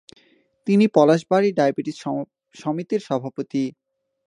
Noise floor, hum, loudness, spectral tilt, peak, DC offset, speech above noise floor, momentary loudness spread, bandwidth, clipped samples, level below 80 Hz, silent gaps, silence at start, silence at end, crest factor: -59 dBFS; none; -21 LUFS; -7 dB/octave; -2 dBFS; under 0.1%; 39 dB; 13 LU; 10.5 kHz; under 0.1%; -72 dBFS; none; 0.65 s; 0.55 s; 20 dB